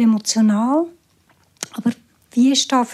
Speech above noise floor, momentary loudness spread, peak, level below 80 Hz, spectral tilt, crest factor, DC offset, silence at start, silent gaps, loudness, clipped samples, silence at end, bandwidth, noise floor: 42 dB; 15 LU; -4 dBFS; -70 dBFS; -4 dB/octave; 16 dB; under 0.1%; 0 s; none; -18 LUFS; under 0.1%; 0 s; 13.5 kHz; -58 dBFS